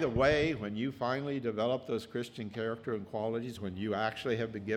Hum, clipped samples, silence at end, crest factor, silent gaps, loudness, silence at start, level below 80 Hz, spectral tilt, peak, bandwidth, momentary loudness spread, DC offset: none; under 0.1%; 0 s; 20 dB; none; -34 LUFS; 0 s; -56 dBFS; -6.5 dB/octave; -14 dBFS; 15 kHz; 10 LU; under 0.1%